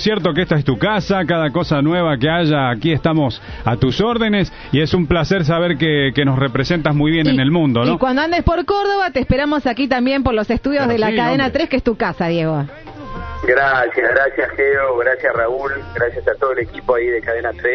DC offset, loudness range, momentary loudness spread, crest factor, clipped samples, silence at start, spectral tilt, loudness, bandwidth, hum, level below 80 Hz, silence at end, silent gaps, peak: under 0.1%; 2 LU; 5 LU; 14 dB; under 0.1%; 0 s; -7.5 dB/octave; -16 LUFS; 6.6 kHz; none; -34 dBFS; 0 s; none; -2 dBFS